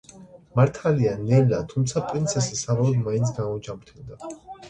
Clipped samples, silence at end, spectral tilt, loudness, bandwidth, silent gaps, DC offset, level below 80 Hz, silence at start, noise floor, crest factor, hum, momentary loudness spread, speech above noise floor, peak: under 0.1%; 0 s; -6.5 dB/octave; -23 LUFS; 9.2 kHz; none; under 0.1%; -52 dBFS; 0.15 s; -47 dBFS; 18 dB; none; 18 LU; 24 dB; -6 dBFS